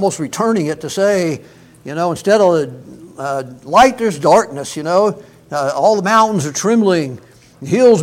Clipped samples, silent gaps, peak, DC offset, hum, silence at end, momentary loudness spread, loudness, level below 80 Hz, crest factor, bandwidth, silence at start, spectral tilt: under 0.1%; none; 0 dBFS; under 0.1%; none; 0 s; 15 LU; -15 LUFS; -52 dBFS; 14 dB; 16.5 kHz; 0 s; -5 dB/octave